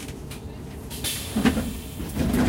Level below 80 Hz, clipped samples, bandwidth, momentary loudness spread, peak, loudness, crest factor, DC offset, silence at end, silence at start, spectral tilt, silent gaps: -36 dBFS; under 0.1%; 16.5 kHz; 14 LU; -8 dBFS; -28 LUFS; 20 dB; under 0.1%; 0 s; 0 s; -4.5 dB/octave; none